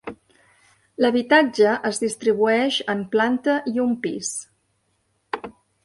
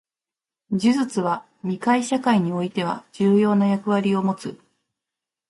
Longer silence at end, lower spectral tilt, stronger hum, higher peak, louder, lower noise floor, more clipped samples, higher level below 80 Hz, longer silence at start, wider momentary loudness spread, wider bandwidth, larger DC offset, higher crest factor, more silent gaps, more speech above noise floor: second, 0.35 s vs 0.95 s; second, -3.5 dB/octave vs -6.5 dB/octave; neither; first, -2 dBFS vs -8 dBFS; about the same, -21 LUFS vs -22 LUFS; second, -69 dBFS vs under -90 dBFS; neither; about the same, -66 dBFS vs -66 dBFS; second, 0.05 s vs 0.7 s; first, 16 LU vs 10 LU; about the same, 11.5 kHz vs 11.5 kHz; neither; about the same, 20 dB vs 16 dB; neither; second, 49 dB vs over 69 dB